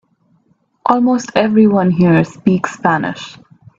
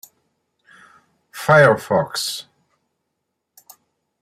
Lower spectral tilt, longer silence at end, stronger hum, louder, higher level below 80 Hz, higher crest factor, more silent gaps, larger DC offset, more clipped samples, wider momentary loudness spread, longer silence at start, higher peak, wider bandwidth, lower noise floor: first, -7 dB/octave vs -4.5 dB/octave; second, 0.5 s vs 1.8 s; neither; about the same, -14 LUFS vs -16 LUFS; first, -52 dBFS vs -60 dBFS; second, 14 dB vs 20 dB; neither; neither; neither; second, 11 LU vs 17 LU; second, 0.85 s vs 1.35 s; about the same, 0 dBFS vs -2 dBFS; second, 7.8 kHz vs 16 kHz; second, -58 dBFS vs -77 dBFS